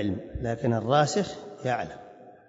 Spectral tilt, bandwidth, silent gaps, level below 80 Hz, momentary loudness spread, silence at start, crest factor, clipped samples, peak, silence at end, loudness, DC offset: -5.5 dB/octave; 8 kHz; none; -50 dBFS; 12 LU; 0 s; 18 dB; under 0.1%; -10 dBFS; 0.15 s; -28 LUFS; under 0.1%